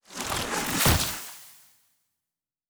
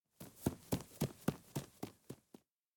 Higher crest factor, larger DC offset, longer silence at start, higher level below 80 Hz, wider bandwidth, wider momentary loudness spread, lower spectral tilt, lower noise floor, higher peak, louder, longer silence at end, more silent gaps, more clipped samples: about the same, 22 dB vs 24 dB; neither; about the same, 0.1 s vs 0.2 s; first, -42 dBFS vs -62 dBFS; about the same, over 20 kHz vs 19.5 kHz; about the same, 17 LU vs 16 LU; second, -3 dB/octave vs -6 dB/octave; first, -89 dBFS vs -66 dBFS; first, -8 dBFS vs -20 dBFS; first, -25 LUFS vs -44 LUFS; first, 1.15 s vs 0.6 s; neither; neither